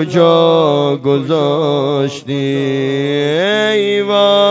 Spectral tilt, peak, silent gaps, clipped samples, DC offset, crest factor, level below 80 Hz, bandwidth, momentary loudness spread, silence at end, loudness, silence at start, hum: -6 dB/octave; 0 dBFS; none; under 0.1%; under 0.1%; 12 dB; -62 dBFS; 7.8 kHz; 6 LU; 0 s; -13 LUFS; 0 s; none